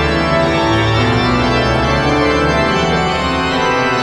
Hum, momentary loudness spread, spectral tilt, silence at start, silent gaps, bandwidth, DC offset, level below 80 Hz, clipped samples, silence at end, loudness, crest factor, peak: none; 2 LU; -5.5 dB/octave; 0 s; none; 12 kHz; under 0.1%; -26 dBFS; under 0.1%; 0 s; -13 LUFS; 12 dB; -2 dBFS